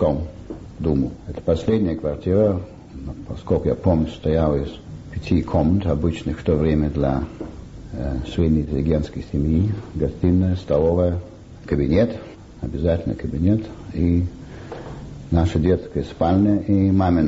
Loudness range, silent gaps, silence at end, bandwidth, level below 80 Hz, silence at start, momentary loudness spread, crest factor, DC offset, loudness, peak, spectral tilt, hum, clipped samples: 2 LU; none; 0 s; 8 kHz; -34 dBFS; 0 s; 16 LU; 14 dB; under 0.1%; -21 LUFS; -6 dBFS; -9 dB/octave; none; under 0.1%